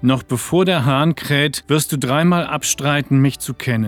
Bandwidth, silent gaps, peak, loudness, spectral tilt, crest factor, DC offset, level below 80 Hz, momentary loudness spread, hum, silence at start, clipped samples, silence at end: 18.5 kHz; none; -2 dBFS; -17 LUFS; -5 dB/octave; 14 dB; under 0.1%; -48 dBFS; 4 LU; none; 0 s; under 0.1%; 0 s